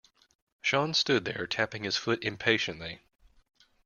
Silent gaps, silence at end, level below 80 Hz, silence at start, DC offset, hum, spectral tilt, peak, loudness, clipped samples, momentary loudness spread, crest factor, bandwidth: none; 0.9 s; -66 dBFS; 0.65 s; under 0.1%; none; -3.5 dB/octave; -8 dBFS; -29 LUFS; under 0.1%; 11 LU; 24 dB; 7.4 kHz